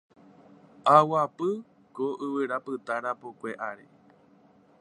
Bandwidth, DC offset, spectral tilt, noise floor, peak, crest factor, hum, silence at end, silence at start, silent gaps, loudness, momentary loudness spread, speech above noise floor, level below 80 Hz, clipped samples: 10.5 kHz; under 0.1%; -6.5 dB/octave; -59 dBFS; -4 dBFS; 26 dB; none; 1.05 s; 0.85 s; none; -27 LUFS; 17 LU; 32 dB; -82 dBFS; under 0.1%